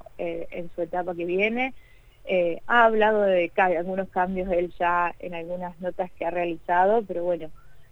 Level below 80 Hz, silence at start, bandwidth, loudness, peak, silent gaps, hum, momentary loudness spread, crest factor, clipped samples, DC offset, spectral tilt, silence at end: -52 dBFS; 0.15 s; 7 kHz; -25 LUFS; -4 dBFS; none; none; 13 LU; 20 dB; under 0.1%; under 0.1%; -7 dB/octave; 0.05 s